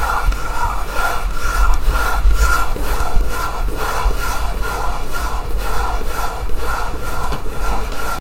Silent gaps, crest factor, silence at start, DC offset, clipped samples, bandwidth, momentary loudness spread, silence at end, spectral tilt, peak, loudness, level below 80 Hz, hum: none; 14 dB; 0 s; under 0.1%; under 0.1%; 16 kHz; 6 LU; 0 s; -4 dB/octave; 0 dBFS; -21 LUFS; -18 dBFS; none